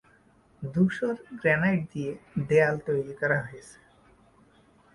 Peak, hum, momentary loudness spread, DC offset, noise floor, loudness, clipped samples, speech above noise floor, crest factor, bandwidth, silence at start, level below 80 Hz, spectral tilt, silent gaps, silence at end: -8 dBFS; none; 12 LU; under 0.1%; -61 dBFS; -27 LUFS; under 0.1%; 34 dB; 20 dB; 11.5 kHz; 0.6 s; -62 dBFS; -7.5 dB/octave; none; 1.2 s